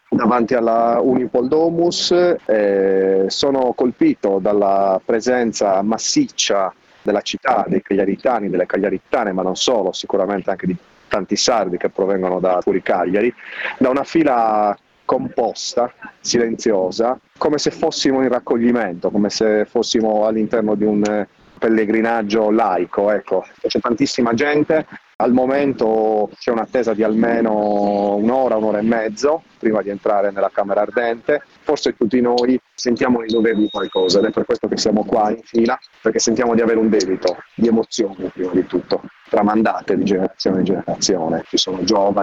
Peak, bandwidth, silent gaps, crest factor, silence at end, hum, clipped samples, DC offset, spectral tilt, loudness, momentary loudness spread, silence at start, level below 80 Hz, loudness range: 0 dBFS; 8.2 kHz; 25.15-25.19 s; 16 dB; 0 s; none; under 0.1%; under 0.1%; -4.5 dB/octave; -18 LUFS; 6 LU; 0.1 s; -54 dBFS; 3 LU